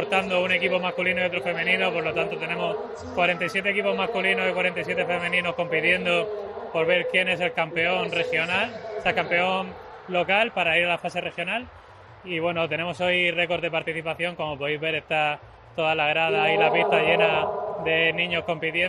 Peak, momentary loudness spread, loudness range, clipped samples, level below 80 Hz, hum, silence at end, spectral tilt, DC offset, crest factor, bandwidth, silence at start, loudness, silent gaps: -6 dBFS; 8 LU; 3 LU; under 0.1%; -60 dBFS; none; 0 s; -5 dB/octave; under 0.1%; 18 dB; 12 kHz; 0 s; -23 LUFS; none